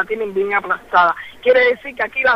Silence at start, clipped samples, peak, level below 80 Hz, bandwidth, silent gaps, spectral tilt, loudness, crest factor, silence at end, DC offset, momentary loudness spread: 0 s; under 0.1%; -2 dBFS; -54 dBFS; 6 kHz; none; -5 dB/octave; -17 LUFS; 14 dB; 0 s; under 0.1%; 7 LU